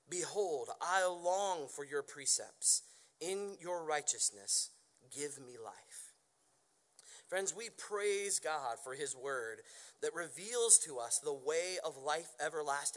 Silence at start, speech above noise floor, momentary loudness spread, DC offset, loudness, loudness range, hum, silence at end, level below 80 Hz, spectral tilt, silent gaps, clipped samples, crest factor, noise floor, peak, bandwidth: 0.1 s; 37 dB; 16 LU; under 0.1%; -36 LUFS; 8 LU; none; 0 s; under -90 dBFS; 0 dB/octave; none; under 0.1%; 28 dB; -75 dBFS; -12 dBFS; 11.5 kHz